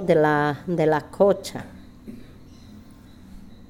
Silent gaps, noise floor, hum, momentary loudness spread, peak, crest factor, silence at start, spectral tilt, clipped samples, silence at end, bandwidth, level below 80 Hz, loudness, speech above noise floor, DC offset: none; -46 dBFS; none; 24 LU; -6 dBFS; 18 dB; 0 s; -6.5 dB/octave; under 0.1%; 0.05 s; 15.5 kHz; -52 dBFS; -22 LUFS; 25 dB; under 0.1%